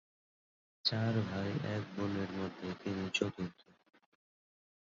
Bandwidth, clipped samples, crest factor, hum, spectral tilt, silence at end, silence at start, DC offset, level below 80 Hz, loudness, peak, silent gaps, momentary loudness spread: 7.6 kHz; under 0.1%; 22 dB; none; -4.5 dB/octave; 1.45 s; 0.85 s; under 0.1%; -64 dBFS; -37 LUFS; -18 dBFS; none; 8 LU